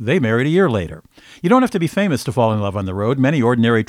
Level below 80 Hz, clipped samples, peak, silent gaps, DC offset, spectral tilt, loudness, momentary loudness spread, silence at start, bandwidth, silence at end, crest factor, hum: -48 dBFS; under 0.1%; -2 dBFS; none; under 0.1%; -7 dB/octave; -17 LUFS; 7 LU; 0 s; 15 kHz; 0 s; 16 dB; none